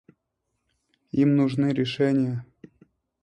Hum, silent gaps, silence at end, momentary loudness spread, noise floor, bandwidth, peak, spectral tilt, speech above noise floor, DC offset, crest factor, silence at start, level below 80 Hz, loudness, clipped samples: none; none; 0.8 s; 9 LU; -79 dBFS; 9 kHz; -10 dBFS; -8 dB/octave; 56 dB; under 0.1%; 16 dB; 1.15 s; -64 dBFS; -23 LUFS; under 0.1%